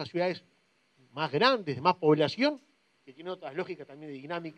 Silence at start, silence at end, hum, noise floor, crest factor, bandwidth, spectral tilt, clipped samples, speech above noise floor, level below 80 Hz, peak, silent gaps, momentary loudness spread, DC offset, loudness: 0 s; 0.05 s; none; -67 dBFS; 22 dB; 9.2 kHz; -6.5 dB/octave; under 0.1%; 38 dB; -82 dBFS; -8 dBFS; none; 19 LU; under 0.1%; -29 LUFS